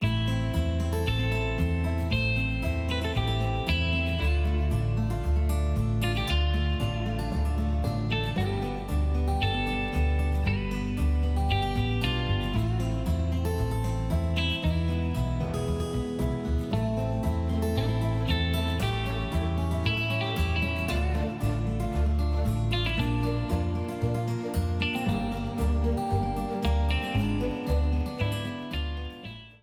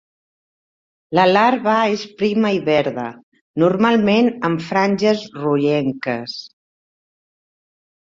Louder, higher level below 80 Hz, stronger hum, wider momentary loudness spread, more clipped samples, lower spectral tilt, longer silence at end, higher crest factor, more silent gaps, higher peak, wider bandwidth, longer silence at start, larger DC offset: second, -28 LUFS vs -17 LUFS; first, -32 dBFS vs -60 dBFS; neither; second, 3 LU vs 11 LU; neither; about the same, -6.5 dB/octave vs -6.5 dB/octave; second, 0.1 s vs 1.75 s; about the same, 14 dB vs 18 dB; second, none vs 3.23-3.32 s, 3.41-3.54 s; second, -12 dBFS vs -2 dBFS; first, 15 kHz vs 7.6 kHz; second, 0 s vs 1.1 s; neither